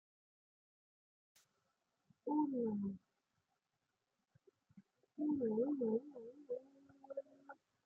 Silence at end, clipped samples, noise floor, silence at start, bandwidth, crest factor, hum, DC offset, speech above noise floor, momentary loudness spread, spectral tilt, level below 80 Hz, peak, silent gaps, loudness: 0.35 s; under 0.1%; -89 dBFS; 2.25 s; 6.8 kHz; 18 dB; none; under 0.1%; 49 dB; 20 LU; -10.5 dB/octave; -90 dBFS; -26 dBFS; none; -42 LUFS